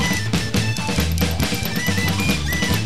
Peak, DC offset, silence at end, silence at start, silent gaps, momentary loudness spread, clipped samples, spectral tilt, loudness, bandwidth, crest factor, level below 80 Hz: -6 dBFS; 3%; 0 s; 0 s; none; 2 LU; under 0.1%; -4 dB/octave; -20 LUFS; 16 kHz; 14 dB; -30 dBFS